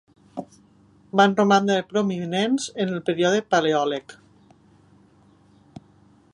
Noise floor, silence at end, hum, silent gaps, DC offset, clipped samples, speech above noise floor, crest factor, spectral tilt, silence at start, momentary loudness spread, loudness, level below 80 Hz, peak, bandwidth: -56 dBFS; 2.2 s; 50 Hz at -50 dBFS; none; under 0.1%; under 0.1%; 35 dB; 20 dB; -5 dB/octave; 0.35 s; 17 LU; -22 LUFS; -68 dBFS; -4 dBFS; 11 kHz